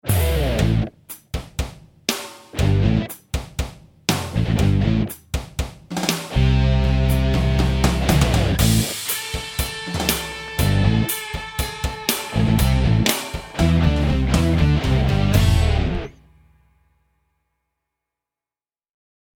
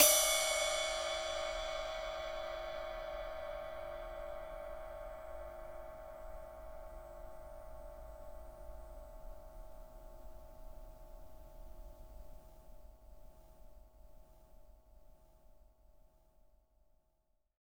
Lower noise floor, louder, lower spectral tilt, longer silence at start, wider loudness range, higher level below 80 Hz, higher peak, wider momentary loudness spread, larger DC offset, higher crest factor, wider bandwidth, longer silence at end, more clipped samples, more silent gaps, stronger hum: first, under -90 dBFS vs -78 dBFS; first, -20 LUFS vs -38 LUFS; first, -5.5 dB/octave vs 0 dB/octave; about the same, 0.05 s vs 0 s; second, 5 LU vs 23 LU; first, -26 dBFS vs -54 dBFS; first, -2 dBFS vs -10 dBFS; second, 12 LU vs 23 LU; neither; second, 18 dB vs 32 dB; about the same, 19 kHz vs over 20 kHz; first, 3.25 s vs 1.6 s; neither; neither; neither